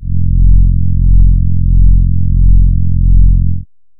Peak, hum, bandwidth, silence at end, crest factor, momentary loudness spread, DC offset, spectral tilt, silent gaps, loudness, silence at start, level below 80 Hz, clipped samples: 0 dBFS; none; 0.4 kHz; 0.35 s; 6 dB; 4 LU; under 0.1%; -17.5 dB/octave; none; -12 LUFS; 0 s; -10 dBFS; 0.4%